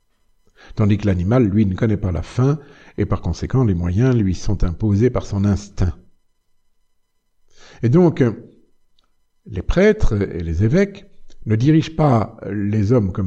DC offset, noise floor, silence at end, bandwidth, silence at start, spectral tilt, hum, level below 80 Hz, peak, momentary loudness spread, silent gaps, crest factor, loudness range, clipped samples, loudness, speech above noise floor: under 0.1%; -63 dBFS; 0 s; 8 kHz; 0.75 s; -8.5 dB/octave; none; -30 dBFS; -2 dBFS; 9 LU; none; 16 dB; 4 LU; under 0.1%; -18 LUFS; 46 dB